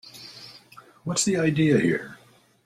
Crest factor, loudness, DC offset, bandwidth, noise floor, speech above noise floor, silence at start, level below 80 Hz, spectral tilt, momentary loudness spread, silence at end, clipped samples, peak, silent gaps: 18 dB; -23 LUFS; under 0.1%; 14.5 kHz; -51 dBFS; 28 dB; 0.05 s; -60 dBFS; -4.5 dB/octave; 22 LU; 0.5 s; under 0.1%; -8 dBFS; none